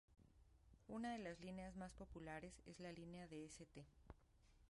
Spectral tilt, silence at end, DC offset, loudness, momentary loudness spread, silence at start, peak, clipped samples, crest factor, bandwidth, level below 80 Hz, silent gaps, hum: -5.5 dB/octave; 0 s; under 0.1%; -55 LUFS; 15 LU; 0.1 s; -38 dBFS; under 0.1%; 18 dB; 11.5 kHz; -70 dBFS; none; none